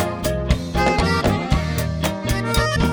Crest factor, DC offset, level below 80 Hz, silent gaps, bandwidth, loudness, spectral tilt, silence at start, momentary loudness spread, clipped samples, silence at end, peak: 16 dB; under 0.1%; -26 dBFS; none; over 20 kHz; -20 LUFS; -5.5 dB/octave; 0 s; 5 LU; under 0.1%; 0 s; -4 dBFS